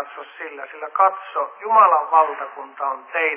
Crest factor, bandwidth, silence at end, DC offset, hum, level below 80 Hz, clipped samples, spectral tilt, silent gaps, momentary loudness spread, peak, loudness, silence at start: 18 dB; 3.6 kHz; 0 s; under 0.1%; none; under -90 dBFS; under 0.1%; -5 dB/octave; none; 19 LU; -2 dBFS; -19 LUFS; 0 s